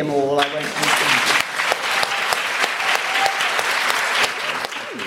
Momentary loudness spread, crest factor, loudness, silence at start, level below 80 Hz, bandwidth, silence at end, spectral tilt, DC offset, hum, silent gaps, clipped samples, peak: 5 LU; 18 dB; -18 LUFS; 0 s; -64 dBFS; 16.5 kHz; 0 s; -1.5 dB/octave; under 0.1%; none; none; under 0.1%; -2 dBFS